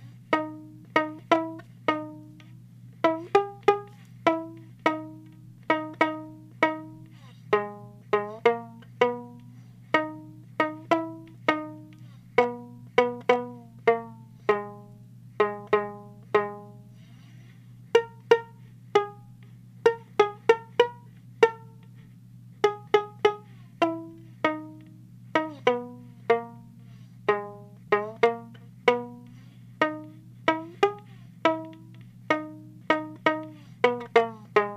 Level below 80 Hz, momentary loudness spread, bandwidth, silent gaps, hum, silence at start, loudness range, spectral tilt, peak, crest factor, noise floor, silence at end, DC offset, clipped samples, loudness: -70 dBFS; 21 LU; 9.8 kHz; none; none; 0 s; 4 LU; -5.5 dB/octave; -4 dBFS; 24 dB; -49 dBFS; 0 s; under 0.1%; under 0.1%; -27 LUFS